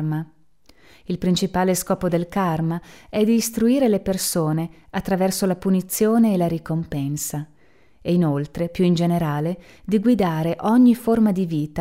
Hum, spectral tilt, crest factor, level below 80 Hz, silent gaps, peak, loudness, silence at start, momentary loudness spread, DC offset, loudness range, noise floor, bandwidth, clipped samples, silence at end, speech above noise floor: none; -6 dB/octave; 14 dB; -48 dBFS; none; -6 dBFS; -21 LUFS; 0 s; 11 LU; 0.2%; 3 LU; -57 dBFS; 16 kHz; under 0.1%; 0 s; 37 dB